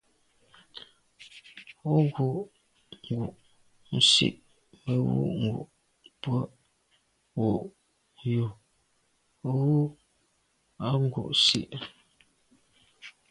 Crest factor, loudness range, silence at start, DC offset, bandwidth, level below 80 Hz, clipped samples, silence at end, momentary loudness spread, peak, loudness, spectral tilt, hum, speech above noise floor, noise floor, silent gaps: 22 dB; 7 LU; 0.75 s; under 0.1%; 11.5 kHz; -62 dBFS; under 0.1%; 0.2 s; 25 LU; -8 dBFS; -27 LUFS; -5 dB/octave; none; 45 dB; -71 dBFS; none